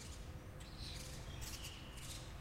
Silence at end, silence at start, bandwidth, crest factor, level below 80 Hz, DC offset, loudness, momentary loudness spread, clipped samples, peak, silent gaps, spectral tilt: 0 s; 0 s; 16 kHz; 16 dB; -54 dBFS; under 0.1%; -50 LUFS; 5 LU; under 0.1%; -34 dBFS; none; -3.5 dB/octave